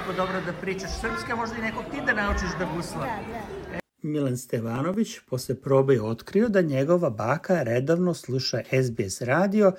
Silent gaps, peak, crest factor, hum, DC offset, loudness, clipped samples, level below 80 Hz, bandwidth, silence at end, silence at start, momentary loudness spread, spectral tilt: none; -8 dBFS; 18 dB; none; under 0.1%; -26 LUFS; under 0.1%; -44 dBFS; 16.5 kHz; 0 s; 0 s; 9 LU; -6 dB/octave